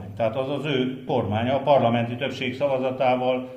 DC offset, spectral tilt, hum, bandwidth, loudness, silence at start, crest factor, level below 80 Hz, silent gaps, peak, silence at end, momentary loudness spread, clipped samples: under 0.1%; -7.5 dB/octave; none; 9.6 kHz; -24 LUFS; 0 s; 18 dB; -62 dBFS; none; -6 dBFS; 0 s; 8 LU; under 0.1%